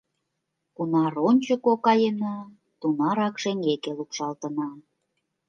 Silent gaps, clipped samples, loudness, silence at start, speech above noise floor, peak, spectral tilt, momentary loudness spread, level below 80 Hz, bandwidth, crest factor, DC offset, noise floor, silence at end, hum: none; under 0.1%; -25 LUFS; 0.8 s; 55 dB; -8 dBFS; -6 dB/octave; 11 LU; -78 dBFS; 7.4 kHz; 18 dB; under 0.1%; -80 dBFS; 0.7 s; none